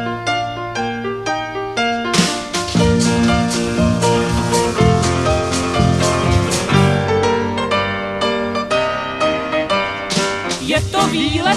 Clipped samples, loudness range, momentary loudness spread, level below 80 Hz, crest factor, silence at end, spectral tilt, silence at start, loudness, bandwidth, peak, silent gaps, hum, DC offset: under 0.1%; 3 LU; 6 LU; -32 dBFS; 16 dB; 0 s; -4.5 dB/octave; 0 s; -17 LUFS; 13.5 kHz; 0 dBFS; none; none; under 0.1%